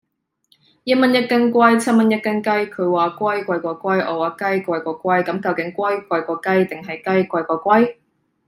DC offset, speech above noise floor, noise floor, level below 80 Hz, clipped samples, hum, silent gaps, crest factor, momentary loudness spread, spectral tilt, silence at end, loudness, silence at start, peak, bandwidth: under 0.1%; 44 dB; -62 dBFS; -68 dBFS; under 0.1%; none; none; 16 dB; 8 LU; -6 dB/octave; 0.55 s; -18 LUFS; 0.85 s; -2 dBFS; 15.5 kHz